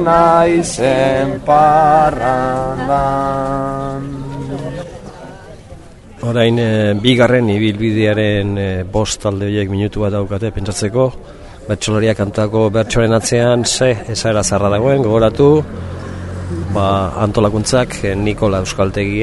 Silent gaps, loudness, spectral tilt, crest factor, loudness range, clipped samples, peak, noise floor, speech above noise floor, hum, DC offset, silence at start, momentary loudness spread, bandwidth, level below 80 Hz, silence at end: none; -14 LUFS; -5.5 dB/octave; 14 dB; 6 LU; under 0.1%; 0 dBFS; -36 dBFS; 22 dB; none; under 0.1%; 0 s; 13 LU; 11.5 kHz; -34 dBFS; 0 s